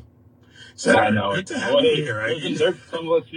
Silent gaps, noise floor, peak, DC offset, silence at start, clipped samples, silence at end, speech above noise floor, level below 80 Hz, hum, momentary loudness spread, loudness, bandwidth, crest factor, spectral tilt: none; -52 dBFS; -4 dBFS; under 0.1%; 0.6 s; under 0.1%; 0 s; 31 dB; -60 dBFS; none; 7 LU; -21 LUFS; 10 kHz; 18 dB; -4.5 dB/octave